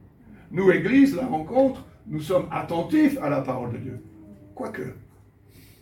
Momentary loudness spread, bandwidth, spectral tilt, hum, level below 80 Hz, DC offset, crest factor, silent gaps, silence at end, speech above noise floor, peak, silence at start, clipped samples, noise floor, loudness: 17 LU; 16.5 kHz; -7.5 dB/octave; none; -56 dBFS; under 0.1%; 20 dB; none; 0.8 s; 30 dB; -4 dBFS; 0.3 s; under 0.1%; -53 dBFS; -23 LUFS